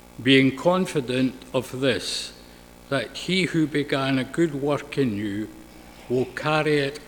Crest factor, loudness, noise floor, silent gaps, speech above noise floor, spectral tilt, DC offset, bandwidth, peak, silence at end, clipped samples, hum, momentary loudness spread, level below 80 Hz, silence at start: 20 dB; -24 LUFS; -47 dBFS; none; 23 dB; -5 dB/octave; under 0.1%; 19 kHz; -4 dBFS; 0 s; under 0.1%; 60 Hz at -55 dBFS; 10 LU; -54 dBFS; 0.2 s